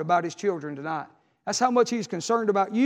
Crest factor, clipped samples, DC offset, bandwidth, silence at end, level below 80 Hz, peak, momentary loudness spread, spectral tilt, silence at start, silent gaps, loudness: 18 dB; under 0.1%; under 0.1%; 12.5 kHz; 0 s; -80 dBFS; -8 dBFS; 11 LU; -4.5 dB/octave; 0 s; none; -26 LUFS